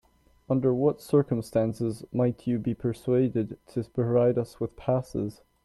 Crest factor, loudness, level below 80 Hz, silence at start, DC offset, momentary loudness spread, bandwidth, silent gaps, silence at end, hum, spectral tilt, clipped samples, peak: 16 dB; -27 LUFS; -56 dBFS; 0.5 s; under 0.1%; 9 LU; 13 kHz; none; 0.35 s; none; -9 dB/octave; under 0.1%; -10 dBFS